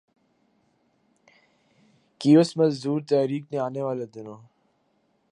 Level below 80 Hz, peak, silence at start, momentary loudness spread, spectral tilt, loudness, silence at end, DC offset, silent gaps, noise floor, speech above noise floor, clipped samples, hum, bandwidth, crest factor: -78 dBFS; -6 dBFS; 2.2 s; 18 LU; -7 dB/octave; -23 LUFS; 0.95 s; under 0.1%; none; -69 dBFS; 46 dB; under 0.1%; none; 11 kHz; 20 dB